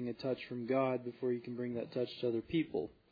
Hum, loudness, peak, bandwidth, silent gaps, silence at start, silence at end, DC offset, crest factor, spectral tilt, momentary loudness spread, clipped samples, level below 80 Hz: none; -38 LUFS; -20 dBFS; 5 kHz; none; 0 s; 0.2 s; under 0.1%; 16 dB; -5.5 dB/octave; 6 LU; under 0.1%; -70 dBFS